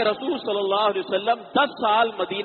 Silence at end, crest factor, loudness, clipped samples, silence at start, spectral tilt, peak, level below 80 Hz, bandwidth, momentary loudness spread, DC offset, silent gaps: 0 s; 16 dB; -22 LUFS; under 0.1%; 0 s; -1 dB/octave; -8 dBFS; -68 dBFS; 4.5 kHz; 4 LU; under 0.1%; none